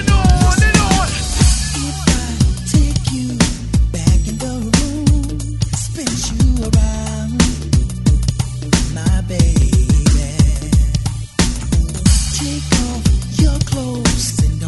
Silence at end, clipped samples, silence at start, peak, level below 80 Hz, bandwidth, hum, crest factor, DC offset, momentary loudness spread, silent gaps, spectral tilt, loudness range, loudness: 0 s; under 0.1%; 0 s; 0 dBFS; -18 dBFS; 12 kHz; none; 14 dB; under 0.1%; 7 LU; none; -4.5 dB/octave; 2 LU; -16 LUFS